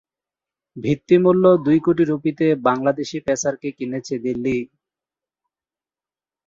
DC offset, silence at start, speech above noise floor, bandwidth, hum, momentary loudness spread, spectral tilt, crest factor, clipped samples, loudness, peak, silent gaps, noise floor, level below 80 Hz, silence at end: under 0.1%; 0.75 s; over 72 dB; 7.8 kHz; none; 12 LU; -6.5 dB/octave; 18 dB; under 0.1%; -19 LUFS; -4 dBFS; none; under -90 dBFS; -58 dBFS; 1.8 s